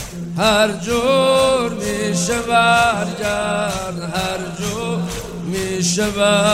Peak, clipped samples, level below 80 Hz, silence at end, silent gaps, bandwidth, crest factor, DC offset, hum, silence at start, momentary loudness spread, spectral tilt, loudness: -2 dBFS; under 0.1%; -40 dBFS; 0 s; none; 16 kHz; 16 dB; under 0.1%; none; 0 s; 10 LU; -4 dB/octave; -18 LUFS